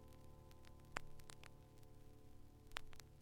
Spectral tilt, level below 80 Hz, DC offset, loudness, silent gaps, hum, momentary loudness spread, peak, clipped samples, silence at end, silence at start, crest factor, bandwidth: -3.5 dB/octave; -62 dBFS; under 0.1%; -58 LUFS; none; none; 13 LU; -24 dBFS; under 0.1%; 0 s; 0 s; 32 dB; 17 kHz